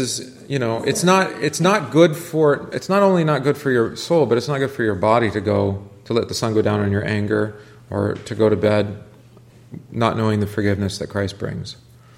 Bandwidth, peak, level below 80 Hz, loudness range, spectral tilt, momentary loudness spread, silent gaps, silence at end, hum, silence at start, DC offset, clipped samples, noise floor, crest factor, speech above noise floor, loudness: 16.5 kHz; 0 dBFS; -54 dBFS; 5 LU; -5.5 dB/octave; 12 LU; none; 0.45 s; none; 0 s; under 0.1%; under 0.1%; -46 dBFS; 18 dB; 27 dB; -19 LUFS